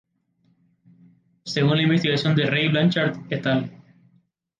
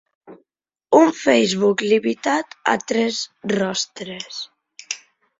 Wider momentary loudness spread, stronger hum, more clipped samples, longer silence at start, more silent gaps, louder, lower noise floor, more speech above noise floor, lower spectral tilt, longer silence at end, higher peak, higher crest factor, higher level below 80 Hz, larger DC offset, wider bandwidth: second, 9 LU vs 16 LU; neither; neither; first, 1.45 s vs 0.3 s; neither; about the same, -21 LUFS vs -19 LUFS; second, -66 dBFS vs -75 dBFS; second, 45 dB vs 55 dB; first, -6.5 dB/octave vs -4 dB/octave; first, 0.8 s vs 0.45 s; second, -8 dBFS vs -2 dBFS; about the same, 16 dB vs 20 dB; about the same, -64 dBFS vs -64 dBFS; neither; about the same, 7.6 kHz vs 8 kHz